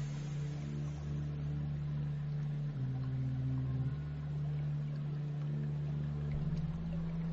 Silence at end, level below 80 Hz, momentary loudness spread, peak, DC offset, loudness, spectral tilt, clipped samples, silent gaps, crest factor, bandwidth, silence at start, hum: 0 s; -50 dBFS; 3 LU; -26 dBFS; under 0.1%; -39 LUFS; -9.5 dB/octave; under 0.1%; none; 12 dB; 7.4 kHz; 0 s; none